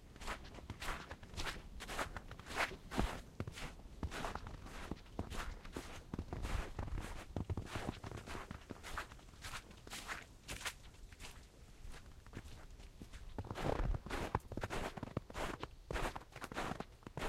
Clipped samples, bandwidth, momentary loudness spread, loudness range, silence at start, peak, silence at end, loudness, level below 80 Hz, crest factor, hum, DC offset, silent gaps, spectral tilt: under 0.1%; 16 kHz; 13 LU; 6 LU; 0 s; -20 dBFS; 0 s; -46 LUFS; -50 dBFS; 26 dB; none; under 0.1%; none; -4.5 dB/octave